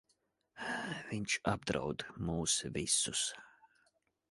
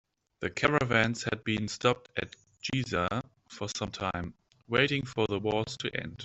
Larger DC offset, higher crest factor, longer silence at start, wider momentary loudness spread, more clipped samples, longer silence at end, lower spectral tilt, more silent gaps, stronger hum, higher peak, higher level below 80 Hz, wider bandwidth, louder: neither; about the same, 22 dB vs 24 dB; first, 0.55 s vs 0.4 s; second, 9 LU vs 12 LU; neither; first, 0.8 s vs 0 s; second, -2.5 dB/octave vs -4.5 dB/octave; neither; neither; second, -16 dBFS vs -6 dBFS; about the same, -60 dBFS vs -58 dBFS; first, 11.5 kHz vs 8.4 kHz; second, -36 LUFS vs -31 LUFS